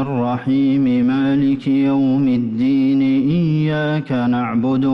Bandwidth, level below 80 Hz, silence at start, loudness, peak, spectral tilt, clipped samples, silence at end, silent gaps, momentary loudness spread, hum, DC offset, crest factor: 5.8 kHz; -52 dBFS; 0 s; -17 LUFS; -10 dBFS; -9.5 dB/octave; under 0.1%; 0 s; none; 3 LU; none; under 0.1%; 6 dB